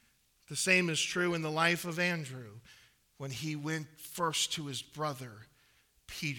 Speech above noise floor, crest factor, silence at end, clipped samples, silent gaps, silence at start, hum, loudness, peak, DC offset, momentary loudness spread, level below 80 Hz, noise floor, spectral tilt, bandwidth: 34 dB; 22 dB; 0 s; under 0.1%; none; 0.5 s; none; -32 LUFS; -12 dBFS; under 0.1%; 18 LU; -70 dBFS; -69 dBFS; -3 dB/octave; 19 kHz